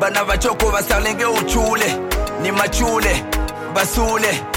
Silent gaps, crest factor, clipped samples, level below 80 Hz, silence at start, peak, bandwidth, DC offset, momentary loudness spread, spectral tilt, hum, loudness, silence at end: none; 14 dB; under 0.1%; -26 dBFS; 0 s; -2 dBFS; 17 kHz; under 0.1%; 5 LU; -3.5 dB/octave; none; -18 LUFS; 0 s